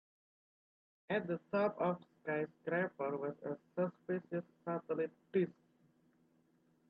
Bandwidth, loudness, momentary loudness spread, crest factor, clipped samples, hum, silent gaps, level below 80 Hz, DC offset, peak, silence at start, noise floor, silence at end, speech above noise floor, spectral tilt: 5.2 kHz; -40 LUFS; 7 LU; 18 dB; under 0.1%; none; none; -86 dBFS; under 0.1%; -24 dBFS; 1.1 s; -74 dBFS; 1.4 s; 35 dB; -6.5 dB/octave